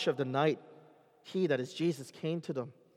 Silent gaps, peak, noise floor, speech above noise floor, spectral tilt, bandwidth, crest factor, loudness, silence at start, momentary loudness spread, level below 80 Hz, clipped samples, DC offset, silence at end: none; -16 dBFS; -60 dBFS; 27 dB; -6 dB/octave; 14.5 kHz; 18 dB; -34 LUFS; 0 s; 9 LU; -88 dBFS; under 0.1%; under 0.1%; 0.25 s